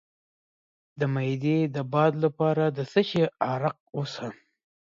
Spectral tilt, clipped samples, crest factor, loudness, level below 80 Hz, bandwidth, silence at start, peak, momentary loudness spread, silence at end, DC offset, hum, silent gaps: -7.5 dB/octave; under 0.1%; 18 dB; -26 LUFS; -70 dBFS; 7.6 kHz; 0.95 s; -10 dBFS; 10 LU; 0.6 s; under 0.1%; none; 3.80-3.86 s